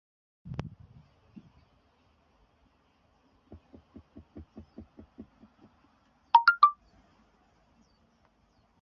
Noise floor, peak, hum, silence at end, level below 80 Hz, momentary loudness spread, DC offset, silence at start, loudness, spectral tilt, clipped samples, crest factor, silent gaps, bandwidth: -68 dBFS; -8 dBFS; none; 2.1 s; -62 dBFS; 30 LU; under 0.1%; 0.45 s; -25 LUFS; -1.5 dB/octave; under 0.1%; 28 dB; none; 6.2 kHz